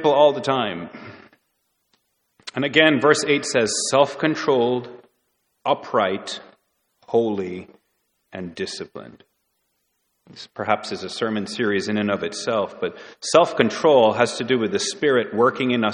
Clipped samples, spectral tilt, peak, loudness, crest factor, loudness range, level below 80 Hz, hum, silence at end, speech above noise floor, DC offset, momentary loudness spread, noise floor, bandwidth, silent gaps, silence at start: under 0.1%; -4 dB/octave; 0 dBFS; -21 LUFS; 22 dB; 10 LU; -66 dBFS; none; 0 s; 51 dB; under 0.1%; 18 LU; -72 dBFS; 11 kHz; none; 0 s